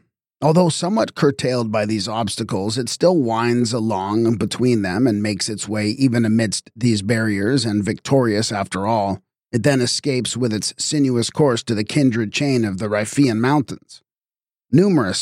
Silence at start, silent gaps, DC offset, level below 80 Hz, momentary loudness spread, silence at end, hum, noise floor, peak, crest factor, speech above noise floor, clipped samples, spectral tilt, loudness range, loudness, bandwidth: 0.4 s; none; under 0.1%; -58 dBFS; 6 LU; 0 s; none; under -90 dBFS; -4 dBFS; 16 dB; over 72 dB; under 0.1%; -5 dB/octave; 1 LU; -19 LUFS; 15 kHz